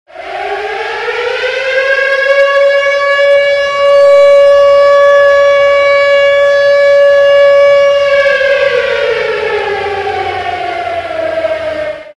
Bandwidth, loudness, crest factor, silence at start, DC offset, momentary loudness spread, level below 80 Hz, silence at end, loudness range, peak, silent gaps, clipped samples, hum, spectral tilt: 8.8 kHz; -8 LUFS; 8 dB; 0.15 s; under 0.1%; 11 LU; -46 dBFS; 0.1 s; 6 LU; 0 dBFS; none; under 0.1%; none; -2.5 dB/octave